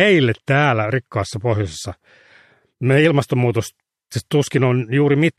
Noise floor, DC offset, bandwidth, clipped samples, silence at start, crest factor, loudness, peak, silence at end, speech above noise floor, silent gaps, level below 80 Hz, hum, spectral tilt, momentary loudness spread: -53 dBFS; under 0.1%; 13.5 kHz; under 0.1%; 0 s; 16 dB; -18 LUFS; -2 dBFS; 0.05 s; 35 dB; none; -52 dBFS; none; -6.5 dB/octave; 14 LU